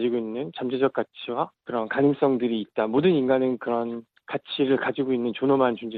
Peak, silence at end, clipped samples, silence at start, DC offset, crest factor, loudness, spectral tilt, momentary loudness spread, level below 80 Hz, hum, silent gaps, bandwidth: -8 dBFS; 0 s; under 0.1%; 0 s; under 0.1%; 16 dB; -25 LUFS; -9.5 dB/octave; 10 LU; -68 dBFS; none; none; 4.6 kHz